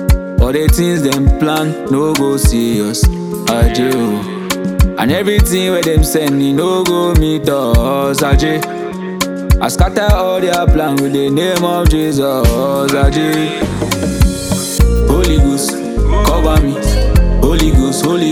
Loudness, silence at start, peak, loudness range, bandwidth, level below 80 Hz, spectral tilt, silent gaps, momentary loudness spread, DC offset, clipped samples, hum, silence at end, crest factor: -13 LUFS; 0 s; 0 dBFS; 1 LU; 16.5 kHz; -16 dBFS; -5.5 dB/octave; none; 4 LU; under 0.1%; under 0.1%; none; 0 s; 12 dB